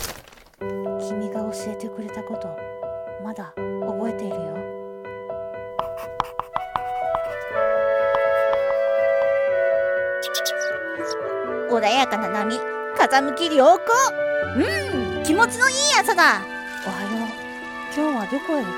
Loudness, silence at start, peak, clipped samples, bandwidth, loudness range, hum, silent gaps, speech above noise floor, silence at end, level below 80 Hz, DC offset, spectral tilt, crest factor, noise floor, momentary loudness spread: -22 LUFS; 0 s; -4 dBFS; under 0.1%; 17 kHz; 11 LU; none; none; 23 dB; 0 s; -54 dBFS; under 0.1%; -3 dB/octave; 18 dB; -44 dBFS; 15 LU